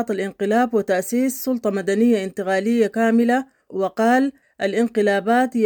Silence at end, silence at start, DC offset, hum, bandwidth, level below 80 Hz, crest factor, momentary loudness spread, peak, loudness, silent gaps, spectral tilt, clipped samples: 0 s; 0 s; under 0.1%; none; 19 kHz; -66 dBFS; 14 dB; 7 LU; -6 dBFS; -20 LUFS; none; -5.5 dB/octave; under 0.1%